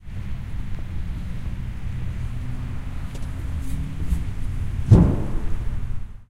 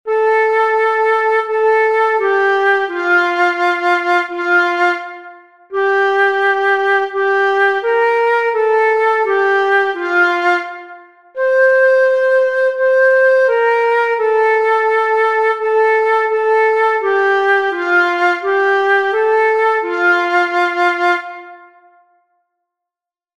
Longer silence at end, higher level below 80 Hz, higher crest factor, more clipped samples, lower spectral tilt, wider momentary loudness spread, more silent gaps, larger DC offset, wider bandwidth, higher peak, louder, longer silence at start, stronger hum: second, 0.05 s vs 1.8 s; first, -28 dBFS vs -70 dBFS; first, 22 dB vs 10 dB; neither; first, -8.5 dB/octave vs -2 dB/octave; first, 16 LU vs 3 LU; neither; neither; first, 12 kHz vs 10.5 kHz; about the same, -2 dBFS vs -4 dBFS; second, -26 LUFS vs -13 LUFS; about the same, 0 s vs 0.05 s; neither